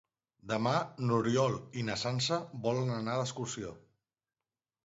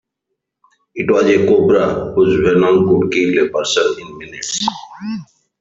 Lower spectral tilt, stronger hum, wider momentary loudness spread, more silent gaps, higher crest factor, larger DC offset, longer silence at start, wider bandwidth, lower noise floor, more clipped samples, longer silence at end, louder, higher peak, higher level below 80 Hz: about the same, -5 dB/octave vs -5 dB/octave; neither; second, 8 LU vs 15 LU; neither; about the same, 18 dB vs 14 dB; neither; second, 0.45 s vs 0.95 s; about the same, 8 kHz vs 7.8 kHz; first, under -90 dBFS vs -76 dBFS; neither; first, 1.05 s vs 0.35 s; second, -33 LUFS vs -14 LUFS; second, -16 dBFS vs -2 dBFS; second, -68 dBFS vs -48 dBFS